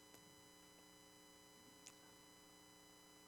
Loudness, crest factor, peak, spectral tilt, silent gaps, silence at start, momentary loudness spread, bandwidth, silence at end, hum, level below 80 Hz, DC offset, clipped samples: -63 LUFS; 30 dB; -36 dBFS; -2 dB/octave; none; 0 s; 3 LU; 19 kHz; 0 s; 60 Hz at -80 dBFS; -86 dBFS; under 0.1%; under 0.1%